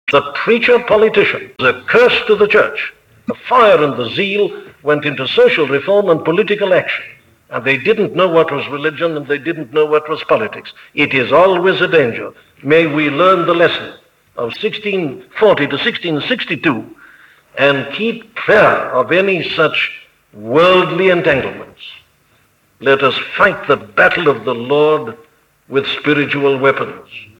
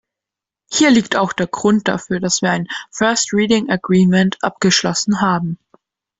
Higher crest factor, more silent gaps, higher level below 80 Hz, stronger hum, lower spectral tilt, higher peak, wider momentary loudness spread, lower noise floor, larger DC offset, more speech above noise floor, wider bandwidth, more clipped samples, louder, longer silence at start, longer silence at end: about the same, 14 dB vs 14 dB; neither; about the same, -54 dBFS vs -52 dBFS; neither; first, -6.5 dB/octave vs -4 dB/octave; about the same, 0 dBFS vs -2 dBFS; first, 13 LU vs 8 LU; second, -55 dBFS vs -86 dBFS; neither; second, 41 dB vs 70 dB; first, 10 kHz vs 8 kHz; neither; first, -13 LUFS vs -16 LUFS; second, 0.05 s vs 0.7 s; second, 0.15 s vs 0.65 s